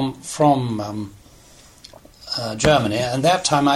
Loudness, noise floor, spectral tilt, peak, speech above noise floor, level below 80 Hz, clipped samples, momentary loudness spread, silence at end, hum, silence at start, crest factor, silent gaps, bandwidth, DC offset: -19 LUFS; -48 dBFS; -4.5 dB/octave; 0 dBFS; 29 dB; -46 dBFS; under 0.1%; 14 LU; 0 s; none; 0 s; 20 dB; none; 15 kHz; under 0.1%